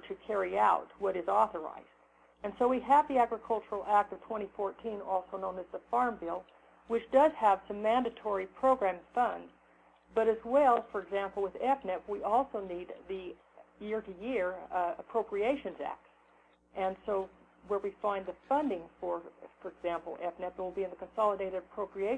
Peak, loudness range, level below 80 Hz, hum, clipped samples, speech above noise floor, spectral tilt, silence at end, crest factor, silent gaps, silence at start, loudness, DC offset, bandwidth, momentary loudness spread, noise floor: -14 dBFS; 6 LU; -66 dBFS; 60 Hz at -65 dBFS; under 0.1%; 33 dB; -6 dB/octave; 0 s; 20 dB; none; 0 s; -33 LUFS; under 0.1%; 9.8 kHz; 15 LU; -66 dBFS